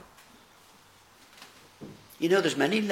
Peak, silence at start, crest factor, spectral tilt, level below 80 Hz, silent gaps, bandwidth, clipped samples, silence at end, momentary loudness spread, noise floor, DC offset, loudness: -10 dBFS; 1.4 s; 22 dB; -4.5 dB/octave; -72 dBFS; none; 16.5 kHz; under 0.1%; 0 s; 25 LU; -57 dBFS; under 0.1%; -26 LUFS